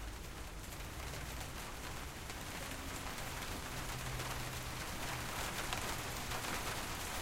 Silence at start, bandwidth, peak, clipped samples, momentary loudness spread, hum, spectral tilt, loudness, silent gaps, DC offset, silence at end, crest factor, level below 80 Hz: 0 s; 16 kHz; -20 dBFS; under 0.1%; 7 LU; none; -3 dB/octave; -43 LUFS; none; under 0.1%; 0 s; 22 dB; -50 dBFS